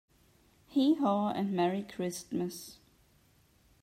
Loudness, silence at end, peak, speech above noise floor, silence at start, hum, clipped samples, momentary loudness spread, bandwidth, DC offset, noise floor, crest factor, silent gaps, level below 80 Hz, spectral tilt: -32 LUFS; 1.1 s; -18 dBFS; 35 dB; 0.7 s; none; under 0.1%; 11 LU; 16 kHz; under 0.1%; -66 dBFS; 16 dB; none; -72 dBFS; -6 dB/octave